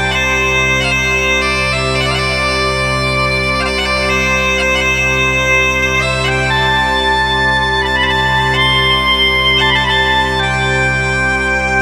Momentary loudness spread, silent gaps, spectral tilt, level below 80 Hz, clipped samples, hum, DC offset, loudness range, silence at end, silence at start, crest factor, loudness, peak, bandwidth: 4 LU; none; -3.5 dB/octave; -26 dBFS; under 0.1%; none; under 0.1%; 2 LU; 0 s; 0 s; 12 dB; -12 LUFS; 0 dBFS; 16 kHz